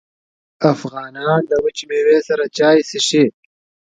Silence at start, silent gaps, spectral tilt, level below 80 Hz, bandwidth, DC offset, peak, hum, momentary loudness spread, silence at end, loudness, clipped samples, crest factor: 0.6 s; none; -4.5 dB/octave; -58 dBFS; 9.4 kHz; under 0.1%; 0 dBFS; none; 7 LU; 0.65 s; -16 LUFS; under 0.1%; 16 dB